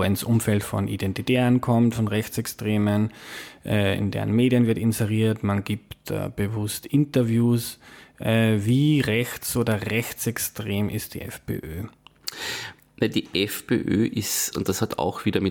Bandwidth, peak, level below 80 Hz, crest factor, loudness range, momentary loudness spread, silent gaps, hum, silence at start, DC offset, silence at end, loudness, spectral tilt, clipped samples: 19 kHz; -8 dBFS; -52 dBFS; 14 dB; 5 LU; 12 LU; none; none; 0 s; under 0.1%; 0 s; -24 LUFS; -5.5 dB/octave; under 0.1%